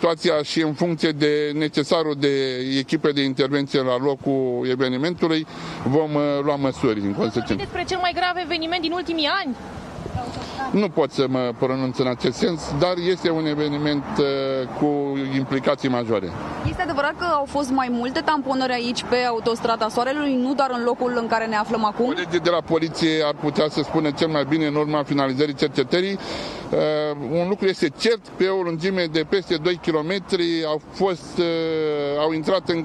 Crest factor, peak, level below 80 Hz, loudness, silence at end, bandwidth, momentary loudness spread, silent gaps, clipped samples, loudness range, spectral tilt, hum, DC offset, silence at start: 18 dB; -4 dBFS; -52 dBFS; -22 LUFS; 0 s; 12 kHz; 4 LU; none; under 0.1%; 2 LU; -5.5 dB/octave; none; under 0.1%; 0 s